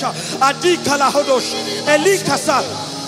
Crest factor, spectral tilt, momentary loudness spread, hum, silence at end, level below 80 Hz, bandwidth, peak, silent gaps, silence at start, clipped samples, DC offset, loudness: 16 dB; -3 dB/octave; 6 LU; none; 0 s; -60 dBFS; 16 kHz; 0 dBFS; none; 0 s; under 0.1%; under 0.1%; -16 LUFS